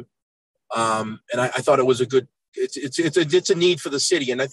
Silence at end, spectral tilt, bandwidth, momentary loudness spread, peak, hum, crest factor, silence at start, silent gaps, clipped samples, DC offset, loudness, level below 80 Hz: 0 s; -4 dB/octave; 12.5 kHz; 10 LU; -6 dBFS; none; 16 dB; 0 s; 0.22-0.54 s, 2.48-2.52 s; under 0.1%; under 0.1%; -21 LUFS; -70 dBFS